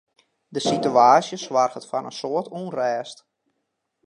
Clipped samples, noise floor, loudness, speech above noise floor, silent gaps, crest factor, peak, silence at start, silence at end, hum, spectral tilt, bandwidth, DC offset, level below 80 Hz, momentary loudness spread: under 0.1%; -77 dBFS; -22 LUFS; 56 dB; none; 20 dB; -2 dBFS; 0.5 s; 0.9 s; none; -4.5 dB/octave; 11 kHz; under 0.1%; -74 dBFS; 15 LU